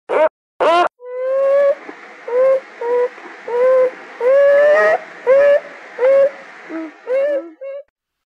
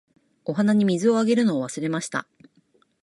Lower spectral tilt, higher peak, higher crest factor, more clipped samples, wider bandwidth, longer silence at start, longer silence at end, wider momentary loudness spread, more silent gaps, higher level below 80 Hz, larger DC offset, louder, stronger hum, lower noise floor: second, -3.5 dB/octave vs -6 dB/octave; first, -4 dBFS vs -10 dBFS; about the same, 12 dB vs 14 dB; neither; second, 8 kHz vs 11.5 kHz; second, 0.1 s vs 0.45 s; second, 0.45 s vs 0.8 s; first, 19 LU vs 11 LU; first, 0.30-0.60 s vs none; about the same, -70 dBFS vs -72 dBFS; neither; first, -15 LUFS vs -23 LUFS; neither; second, -36 dBFS vs -63 dBFS